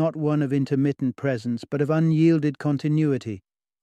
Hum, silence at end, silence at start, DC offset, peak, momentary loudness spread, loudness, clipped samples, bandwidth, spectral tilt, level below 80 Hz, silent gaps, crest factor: none; 0.45 s; 0 s; under 0.1%; -8 dBFS; 9 LU; -23 LUFS; under 0.1%; 9 kHz; -9 dB/octave; -66 dBFS; none; 14 dB